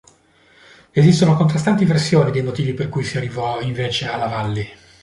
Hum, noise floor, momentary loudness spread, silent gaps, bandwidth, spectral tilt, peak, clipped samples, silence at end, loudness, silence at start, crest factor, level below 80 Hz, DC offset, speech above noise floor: none; -53 dBFS; 9 LU; none; 11.5 kHz; -6.5 dB/octave; -2 dBFS; under 0.1%; 0.3 s; -18 LUFS; 0.95 s; 16 dB; -48 dBFS; under 0.1%; 36 dB